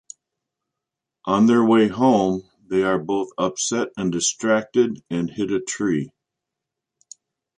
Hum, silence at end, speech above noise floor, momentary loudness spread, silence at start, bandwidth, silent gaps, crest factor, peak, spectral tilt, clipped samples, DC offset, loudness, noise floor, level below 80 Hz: none; 1.5 s; 65 dB; 10 LU; 1.25 s; 10 kHz; none; 18 dB; -4 dBFS; -4.5 dB/octave; under 0.1%; under 0.1%; -21 LUFS; -85 dBFS; -58 dBFS